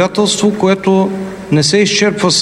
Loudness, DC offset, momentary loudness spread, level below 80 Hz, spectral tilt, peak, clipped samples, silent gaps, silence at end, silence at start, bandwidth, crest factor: -12 LUFS; under 0.1%; 6 LU; -48 dBFS; -4 dB/octave; 0 dBFS; under 0.1%; none; 0 s; 0 s; 12.5 kHz; 12 dB